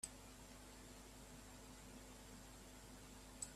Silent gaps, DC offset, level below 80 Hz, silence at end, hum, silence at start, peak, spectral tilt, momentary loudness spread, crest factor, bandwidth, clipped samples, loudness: none; under 0.1%; -64 dBFS; 0 s; none; 0 s; -32 dBFS; -3 dB/octave; 3 LU; 24 dB; 15.5 kHz; under 0.1%; -58 LUFS